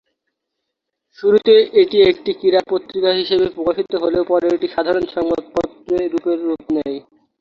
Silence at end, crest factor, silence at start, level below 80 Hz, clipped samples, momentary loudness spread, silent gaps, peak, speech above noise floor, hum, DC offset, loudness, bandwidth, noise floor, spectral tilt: 0.4 s; 16 dB; 1.2 s; -52 dBFS; under 0.1%; 10 LU; none; -2 dBFS; 62 dB; none; under 0.1%; -17 LUFS; 7 kHz; -78 dBFS; -6.5 dB/octave